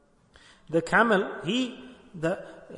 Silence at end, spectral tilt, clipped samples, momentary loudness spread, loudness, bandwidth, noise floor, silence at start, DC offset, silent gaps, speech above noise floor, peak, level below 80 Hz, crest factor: 0 s; -5 dB/octave; under 0.1%; 15 LU; -26 LUFS; 11 kHz; -57 dBFS; 0.7 s; under 0.1%; none; 31 dB; -8 dBFS; -60 dBFS; 20 dB